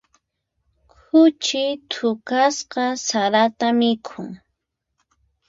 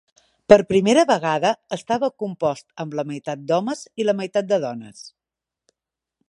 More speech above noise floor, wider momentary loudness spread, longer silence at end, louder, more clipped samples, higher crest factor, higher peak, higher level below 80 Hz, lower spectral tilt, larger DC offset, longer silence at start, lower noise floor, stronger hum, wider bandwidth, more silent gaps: second, 57 dB vs 67 dB; second, 11 LU vs 15 LU; about the same, 1.15 s vs 1.2 s; about the same, -19 LUFS vs -21 LUFS; neither; about the same, 18 dB vs 22 dB; second, -4 dBFS vs 0 dBFS; second, -66 dBFS vs -56 dBFS; second, -3 dB/octave vs -5 dB/octave; neither; first, 1.15 s vs 0.5 s; second, -77 dBFS vs -87 dBFS; neither; second, 7.8 kHz vs 11.5 kHz; neither